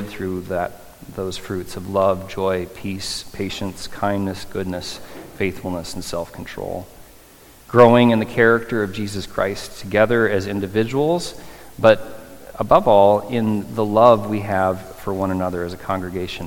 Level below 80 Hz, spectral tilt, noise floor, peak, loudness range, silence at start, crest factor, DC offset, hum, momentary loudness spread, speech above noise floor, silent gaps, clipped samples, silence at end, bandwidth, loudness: -46 dBFS; -6 dB/octave; -46 dBFS; 0 dBFS; 9 LU; 0 s; 20 dB; under 0.1%; none; 16 LU; 27 dB; none; under 0.1%; 0 s; 17.5 kHz; -20 LUFS